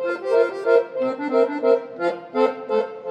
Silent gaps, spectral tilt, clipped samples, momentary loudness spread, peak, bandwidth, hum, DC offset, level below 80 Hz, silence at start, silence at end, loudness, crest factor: none; -5.5 dB/octave; under 0.1%; 6 LU; -4 dBFS; 8.4 kHz; none; under 0.1%; -84 dBFS; 0 s; 0 s; -21 LUFS; 16 dB